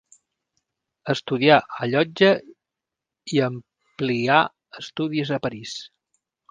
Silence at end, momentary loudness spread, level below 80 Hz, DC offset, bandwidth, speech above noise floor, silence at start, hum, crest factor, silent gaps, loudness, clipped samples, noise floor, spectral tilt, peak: 0.65 s; 18 LU; -66 dBFS; under 0.1%; 9.6 kHz; 65 dB; 1.05 s; none; 24 dB; none; -22 LUFS; under 0.1%; -86 dBFS; -5.5 dB/octave; 0 dBFS